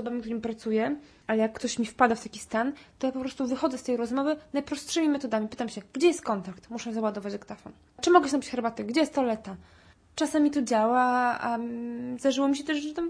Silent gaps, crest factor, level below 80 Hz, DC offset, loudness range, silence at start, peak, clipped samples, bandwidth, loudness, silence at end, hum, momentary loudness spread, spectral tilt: none; 22 dB; -62 dBFS; under 0.1%; 3 LU; 0 s; -6 dBFS; under 0.1%; 11 kHz; -28 LUFS; 0 s; none; 12 LU; -4 dB/octave